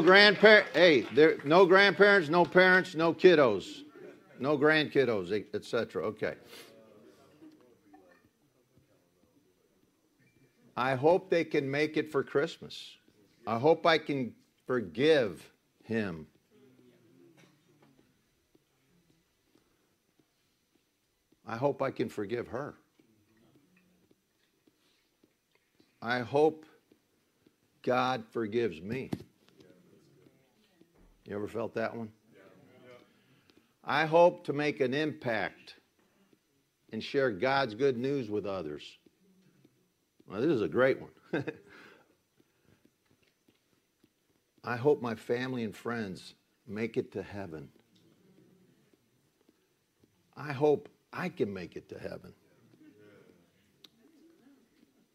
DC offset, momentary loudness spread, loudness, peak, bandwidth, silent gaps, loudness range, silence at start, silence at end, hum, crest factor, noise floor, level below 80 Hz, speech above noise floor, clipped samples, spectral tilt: under 0.1%; 22 LU; -28 LUFS; -6 dBFS; 14 kHz; none; 16 LU; 0 s; 2.85 s; none; 26 dB; -76 dBFS; -74 dBFS; 48 dB; under 0.1%; -6 dB/octave